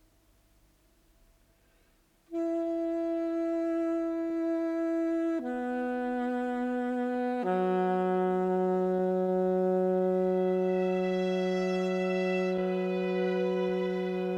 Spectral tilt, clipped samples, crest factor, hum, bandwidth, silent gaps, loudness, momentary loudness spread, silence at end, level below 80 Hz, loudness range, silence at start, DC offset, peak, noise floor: -8 dB/octave; under 0.1%; 12 dB; 50 Hz at -75 dBFS; 8 kHz; none; -30 LUFS; 4 LU; 0 s; -68 dBFS; 5 LU; 2.3 s; under 0.1%; -18 dBFS; -66 dBFS